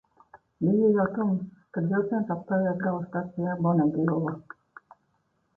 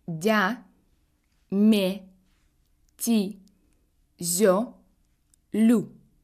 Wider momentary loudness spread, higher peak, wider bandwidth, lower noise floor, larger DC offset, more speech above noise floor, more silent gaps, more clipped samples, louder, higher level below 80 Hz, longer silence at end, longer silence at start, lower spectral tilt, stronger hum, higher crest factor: second, 10 LU vs 14 LU; second, -12 dBFS vs -8 dBFS; second, 1.8 kHz vs 15.5 kHz; first, -72 dBFS vs -67 dBFS; neither; about the same, 46 dB vs 45 dB; neither; neither; second, -27 LUFS vs -24 LUFS; about the same, -64 dBFS vs -66 dBFS; first, 1.15 s vs 0.35 s; first, 0.35 s vs 0.1 s; first, -12.5 dB/octave vs -4.5 dB/octave; neither; about the same, 16 dB vs 18 dB